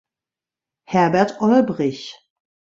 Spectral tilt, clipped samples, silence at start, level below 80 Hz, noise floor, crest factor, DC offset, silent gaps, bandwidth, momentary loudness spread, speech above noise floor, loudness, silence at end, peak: -6.5 dB/octave; under 0.1%; 0.9 s; -62 dBFS; -89 dBFS; 18 dB; under 0.1%; none; 7.8 kHz; 14 LU; 71 dB; -18 LUFS; 0.65 s; -2 dBFS